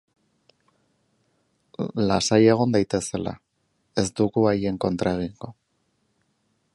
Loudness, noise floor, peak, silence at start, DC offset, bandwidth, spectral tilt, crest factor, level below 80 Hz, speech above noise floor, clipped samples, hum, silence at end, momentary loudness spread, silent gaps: -23 LUFS; -71 dBFS; -4 dBFS; 1.8 s; under 0.1%; 11.5 kHz; -5.5 dB/octave; 20 dB; -52 dBFS; 49 dB; under 0.1%; none; 1.2 s; 18 LU; none